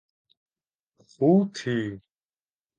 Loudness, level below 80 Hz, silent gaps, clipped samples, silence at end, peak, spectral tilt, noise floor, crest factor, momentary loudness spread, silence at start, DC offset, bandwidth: -25 LUFS; -68 dBFS; none; under 0.1%; 0.8 s; -8 dBFS; -7.5 dB/octave; under -90 dBFS; 20 dB; 14 LU; 1.2 s; under 0.1%; 9 kHz